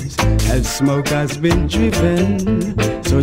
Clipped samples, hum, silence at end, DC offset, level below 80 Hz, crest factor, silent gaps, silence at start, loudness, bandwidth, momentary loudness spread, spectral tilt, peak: under 0.1%; none; 0 s; under 0.1%; -24 dBFS; 12 dB; none; 0 s; -17 LUFS; 16.5 kHz; 3 LU; -5.5 dB/octave; -4 dBFS